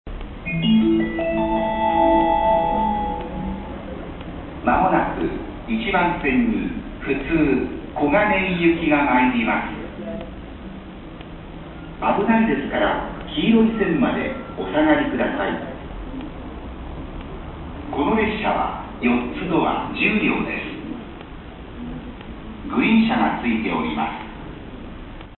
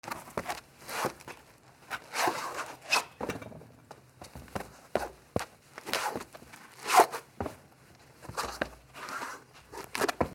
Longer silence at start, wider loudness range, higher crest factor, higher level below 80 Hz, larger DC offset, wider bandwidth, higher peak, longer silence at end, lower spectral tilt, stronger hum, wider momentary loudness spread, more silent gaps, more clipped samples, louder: about the same, 0.05 s vs 0.05 s; about the same, 5 LU vs 7 LU; second, 18 dB vs 28 dB; first, -38 dBFS vs -60 dBFS; neither; second, 4.2 kHz vs 19.5 kHz; first, -4 dBFS vs -8 dBFS; about the same, 0 s vs 0 s; first, -11 dB/octave vs -2.5 dB/octave; neither; about the same, 19 LU vs 21 LU; neither; neither; first, -20 LUFS vs -33 LUFS